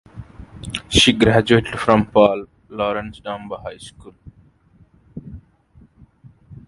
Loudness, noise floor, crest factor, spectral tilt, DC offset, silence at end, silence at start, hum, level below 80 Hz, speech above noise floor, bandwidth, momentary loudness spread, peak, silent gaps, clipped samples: -17 LUFS; -53 dBFS; 20 dB; -4.5 dB/octave; under 0.1%; 0.1 s; 0.15 s; none; -40 dBFS; 36 dB; 11.5 kHz; 25 LU; 0 dBFS; none; under 0.1%